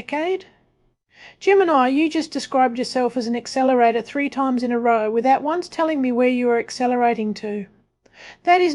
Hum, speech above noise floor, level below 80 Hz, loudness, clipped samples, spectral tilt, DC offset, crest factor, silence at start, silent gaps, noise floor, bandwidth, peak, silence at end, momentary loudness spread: none; 44 dB; -66 dBFS; -20 LUFS; under 0.1%; -4.5 dB/octave; under 0.1%; 18 dB; 0 s; none; -64 dBFS; 11.5 kHz; -2 dBFS; 0 s; 9 LU